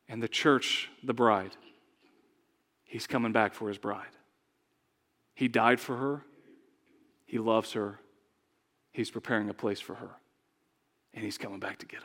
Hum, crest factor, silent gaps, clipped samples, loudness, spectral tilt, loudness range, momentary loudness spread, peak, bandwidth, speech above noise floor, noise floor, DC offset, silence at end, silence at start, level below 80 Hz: none; 26 dB; none; under 0.1%; -31 LUFS; -4.5 dB/octave; 6 LU; 17 LU; -8 dBFS; 17 kHz; 45 dB; -76 dBFS; under 0.1%; 0 s; 0.1 s; -84 dBFS